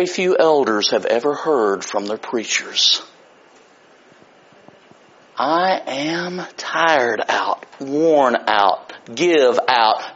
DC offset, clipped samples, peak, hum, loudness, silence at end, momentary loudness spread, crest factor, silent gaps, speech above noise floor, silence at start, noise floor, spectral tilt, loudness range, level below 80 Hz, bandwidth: under 0.1%; under 0.1%; 0 dBFS; none; -17 LUFS; 0 s; 9 LU; 18 dB; none; 32 dB; 0 s; -50 dBFS; -1 dB/octave; 7 LU; -68 dBFS; 7.8 kHz